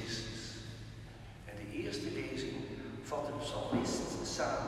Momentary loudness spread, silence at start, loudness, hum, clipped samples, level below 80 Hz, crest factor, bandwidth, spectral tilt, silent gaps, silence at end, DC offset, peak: 14 LU; 0 s; -40 LUFS; none; under 0.1%; -56 dBFS; 18 dB; 14 kHz; -4.5 dB/octave; none; 0 s; under 0.1%; -22 dBFS